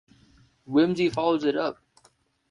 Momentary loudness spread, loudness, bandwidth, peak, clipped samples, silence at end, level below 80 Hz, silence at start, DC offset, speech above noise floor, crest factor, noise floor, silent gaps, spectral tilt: 6 LU; -25 LUFS; 10.5 kHz; -10 dBFS; under 0.1%; 0.75 s; -64 dBFS; 0.7 s; under 0.1%; 40 dB; 16 dB; -64 dBFS; none; -6.5 dB/octave